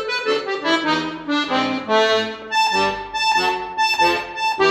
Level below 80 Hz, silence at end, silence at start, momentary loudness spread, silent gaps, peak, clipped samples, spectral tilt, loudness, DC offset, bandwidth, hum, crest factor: -54 dBFS; 0 s; 0 s; 5 LU; none; -4 dBFS; under 0.1%; -3 dB/octave; -19 LUFS; under 0.1%; 14 kHz; none; 16 dB